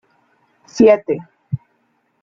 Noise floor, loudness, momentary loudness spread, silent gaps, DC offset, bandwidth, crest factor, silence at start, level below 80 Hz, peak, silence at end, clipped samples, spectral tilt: -64 dBFS; -15 LUFS; 17 LU; none; under 0.1%; 7.4 kHz; 18 dB; 0.75 s; -56 dBFS; -2 dBFS; 0.65 s; under 0.1%; -7 dB/octave